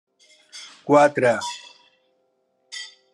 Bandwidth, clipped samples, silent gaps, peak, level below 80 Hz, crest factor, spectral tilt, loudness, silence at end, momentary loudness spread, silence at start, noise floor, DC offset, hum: 11.5 kHz; under 0.1%; none; -4 dBFS; -76 dBFS; 20 dB; -4.5 dB/octave; -19 LUFS; 0.25 s; 23 LU; 0.55 s; -69 dBFS; under 0.1%; none